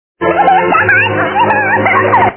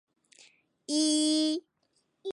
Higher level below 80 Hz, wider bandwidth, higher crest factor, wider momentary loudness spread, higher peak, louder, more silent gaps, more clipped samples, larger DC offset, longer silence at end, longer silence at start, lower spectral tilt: first, -42 dBFS vs -84 dBFS; second, 4 kHz vs 11.5 kHz; second, 10 dB vs 16 dB; second, 3 LU vs 17 LU; first, 0 dBFS vs -16 dBFS; first, -9 LUFS vs -28 LUFS; neither; first, 0.1% vs under 0.1%; neither; about the same, 0 s vs 0 s; second, 0.2 s vs 0.9 s; first, -9 dB/octave vs -1 dB/octave